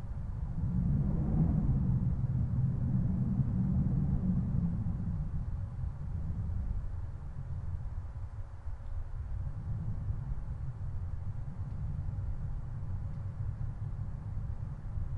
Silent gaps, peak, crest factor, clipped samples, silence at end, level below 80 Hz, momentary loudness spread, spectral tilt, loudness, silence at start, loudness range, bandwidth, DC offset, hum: none; -18 dBFS; 16 dB; under 0.1%; 0 s; -40 dBFS; 11 LU; -11 dB/octave; -36 LUFS; 0 s; 9 LU; 2.8 kHz; under 0.1%; none